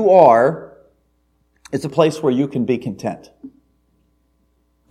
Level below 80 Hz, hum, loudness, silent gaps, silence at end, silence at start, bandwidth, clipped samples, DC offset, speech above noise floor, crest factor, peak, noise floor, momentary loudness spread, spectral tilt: -60 dBFS; none; -17 LUFS; none; 1.4 s; 0 s; 12.5 kHz; under 0.1%; under 0.1%; 47 dB; 18 dB; 0 dBFS; -63 dBFS; 18 LU; -7 dB/octave